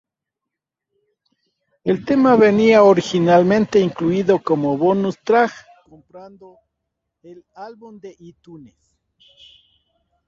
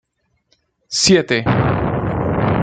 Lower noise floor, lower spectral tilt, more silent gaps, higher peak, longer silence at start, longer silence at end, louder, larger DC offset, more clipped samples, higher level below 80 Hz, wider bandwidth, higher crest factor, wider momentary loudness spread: first, -83 dBFS vs -64 dBFS; first, -7 dB/octave vs -4.5 dB/octave; neither; about the same, -2 dBFS vs 0 dBFS; first, 1.85 s vs 0.9 s; first, 1.7 s vs 0 s; about the same, -16 LUFS vs -16 LUFS; neither; neither; second, -60 dBFS vs -36 dBFS; second, 7.6 kHz vs 9.4 kHz; about the same, 18 dB vs 18 dB; first, 21 LU vs 7 LU